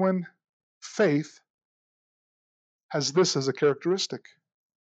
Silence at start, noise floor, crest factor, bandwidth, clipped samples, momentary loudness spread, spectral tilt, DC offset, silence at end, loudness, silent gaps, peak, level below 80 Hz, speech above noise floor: 0 s; under -90 dBFS; 18 dB; 8.8 kHz; under 0.1%; 18 LU; -4.5 dB/octave; under 0.1%; 0.65 s; -26 LUFS; 0.49-0.81 s, 1.50-1.58 s, 1.65-2.89 s; -10 dBFS; -86 dBFS; over 64 dB